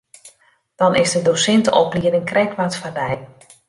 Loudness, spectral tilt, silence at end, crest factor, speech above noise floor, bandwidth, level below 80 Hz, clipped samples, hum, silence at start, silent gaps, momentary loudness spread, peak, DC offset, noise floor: -17 LUFS; -4 dB/octave; 0.45 s; 16 dB; 39 dB; 11.5 kHz; -54 dBFS; under 0.1%; none; 0.25 s; none; 9 LU; -2 dBFS; under 0.1%; -57 dBFS